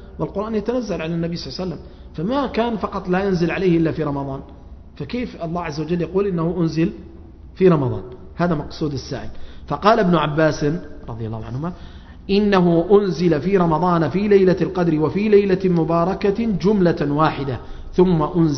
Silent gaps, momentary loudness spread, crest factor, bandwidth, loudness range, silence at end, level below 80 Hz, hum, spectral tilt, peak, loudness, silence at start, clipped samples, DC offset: none; 14 LU; 20 dB; 6.4 kHz; 6 LU; 0 s; -40 dBFS; none; -8 dB/octave; 0 dBFS; -19 LUFS; 0 s; under 0.1%; under 0.1%